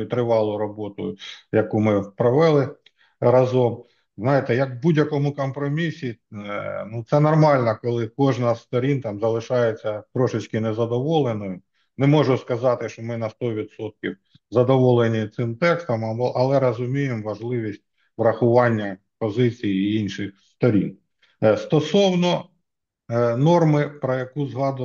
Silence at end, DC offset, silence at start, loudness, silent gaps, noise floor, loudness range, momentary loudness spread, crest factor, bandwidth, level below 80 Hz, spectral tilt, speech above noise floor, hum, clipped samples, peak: 0 s; under 0.1%; 0 s; -22 LUFS; none; -79 dBFS; 3 LU; 13 LU; 18 dB; 7.2 kHz; -66 dBFS; -7.5 dB/octave; 59 dB; none; under 0.1%; -4 dBFS